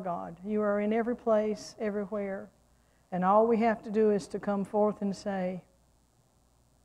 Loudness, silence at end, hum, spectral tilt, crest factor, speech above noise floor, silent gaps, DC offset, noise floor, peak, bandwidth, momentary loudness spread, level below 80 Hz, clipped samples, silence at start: -30 LUFS; 1.25 s; none; -7 dB/octave; 18 dB; 38 dB; none; under 0.1%; -67 dBFS; -12 dBFS; 11 kHz; 11 LU; -66 dBFS; under 0.1%; 0 s